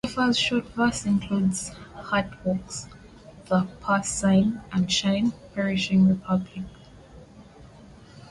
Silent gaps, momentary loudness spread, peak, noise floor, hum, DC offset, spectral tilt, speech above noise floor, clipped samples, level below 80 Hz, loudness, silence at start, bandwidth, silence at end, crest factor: none; 15 LU; -10 dBFS; -48 dBFS; none; under 0.1%; -5 dB/octave; 24 dB; under 0.1%; -50 dBFS; -24 LUFS; 0.05 s; 11.5 kHz; 0 s; 16 dB